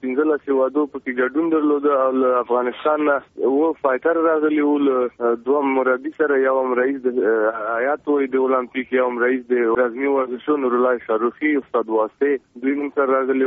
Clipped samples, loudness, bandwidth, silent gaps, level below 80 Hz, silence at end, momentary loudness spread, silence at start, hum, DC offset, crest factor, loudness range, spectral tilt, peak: under 0.1%; -20 LUFS; 3.9 kHz; none; -66 dBFS; 0 s; 4 LU; 0.05 s; none; under 0.1%; 14 dB; 1 LU; -3.5 dB/octave; -4 dBFS